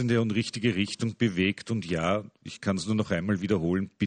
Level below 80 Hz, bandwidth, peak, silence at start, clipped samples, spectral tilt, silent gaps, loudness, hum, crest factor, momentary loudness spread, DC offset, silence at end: -58 dBFS; 9.4 kHz; -12 dBFS; 0 s; under 0.1%; -6 dB/octave; none; -28 LUFS; none; 16 dB; 6 LU; under 0.1%; 0 s